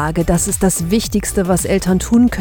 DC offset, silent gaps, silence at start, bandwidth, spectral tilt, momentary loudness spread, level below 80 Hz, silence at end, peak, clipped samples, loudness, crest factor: under 0.1%; none; 0 s; 20 kHz; -5 dB/octave; 3 LU; -28 dBFS; 0 s; -2 dBFS; under 0.1%; -15 LUFS; 14 dB